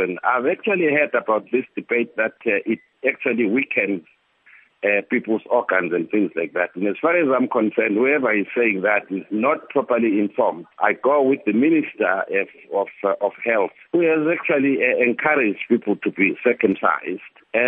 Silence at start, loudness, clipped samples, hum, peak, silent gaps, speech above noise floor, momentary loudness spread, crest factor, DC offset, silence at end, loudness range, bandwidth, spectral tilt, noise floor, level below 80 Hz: 0 s; -20 LUFS; under 0.1%; none; -2 dBFS; none; 32 dB; 6 LU; 18 dB; under 0.1%; 0 s; 3 LU; 3.8 kHz; -10 dB/octave; -53 dBFS; -74 dBFS